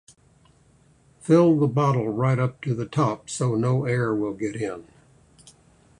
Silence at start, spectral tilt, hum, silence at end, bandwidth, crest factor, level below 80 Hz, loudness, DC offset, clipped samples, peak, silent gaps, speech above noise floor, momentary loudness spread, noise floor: 1.25 s; -7.5 dB/octave; none; 1.2 s; 11 kHz; 18 dB; -58 dBFS; -23 LUFS; under 0.1%; under 0.1%; -6 dBFS; none; 36 dB; 11 LU; -58 dBFS